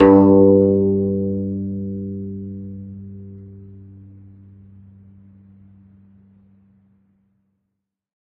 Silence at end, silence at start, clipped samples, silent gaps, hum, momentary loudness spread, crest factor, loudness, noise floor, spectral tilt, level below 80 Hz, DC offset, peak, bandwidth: 4.6 s; 0 s; under 0.1%; none; none; 27 LU; 20 dB; -17 LUFS; -78 dBFS; -10 dB/octave; -52 dBFS; under 0.1%; 0 dBFS; 3.1 kHz